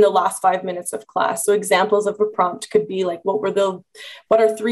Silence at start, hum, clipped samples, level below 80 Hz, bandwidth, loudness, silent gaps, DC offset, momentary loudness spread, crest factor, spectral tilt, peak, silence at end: 0 s; none; under 0.1%; -66 dBFS; 13 kHz; -19 LUFS; none; under 0.1%; 10 LU; 16 dB; -3.5 dB/octave; -4 dBFS; 0 s